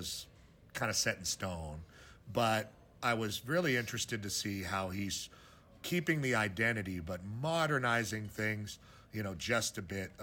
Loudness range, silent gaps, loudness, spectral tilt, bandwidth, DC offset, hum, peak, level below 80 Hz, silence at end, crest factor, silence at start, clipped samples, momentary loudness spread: 2 LU; none; -35 LUFS; -3.5 dB/octave; over 20 kHz; under 0.1%; none; -18 dBFS; -64 dBFS; 0 s; 18 dB; 0 s; under 0.1%; 15 LU